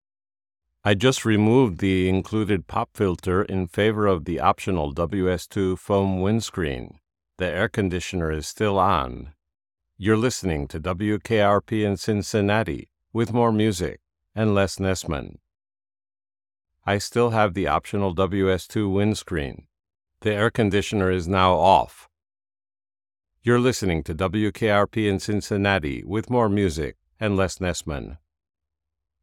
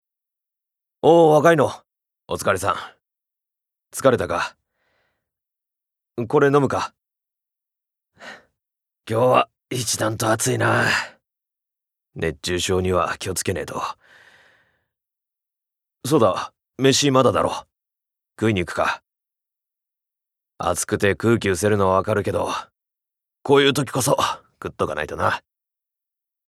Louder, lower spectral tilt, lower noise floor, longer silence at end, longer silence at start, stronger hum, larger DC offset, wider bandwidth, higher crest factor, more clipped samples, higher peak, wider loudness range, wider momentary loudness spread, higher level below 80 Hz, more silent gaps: second, -23 LUFS vs -20 LUFS; first, -6 dB/octave vs -4.5 dB/octave; first, under -90 dBFS vs -84 dBFS; about the same, 1.05 s vs 1.1 s; second, 0.85 s vs 1.05 s; neither; neither; about the same, 15.5 kHz vs 15.5 kHz; about the same, 20 dB vs 22 dB; neither; second, -4 dBFS vs 0 dBFS; second, 3 LU vs 6 LU; second, 10 LU vs 15 LU; first, -46 dBFS vs -58 dBFS; neither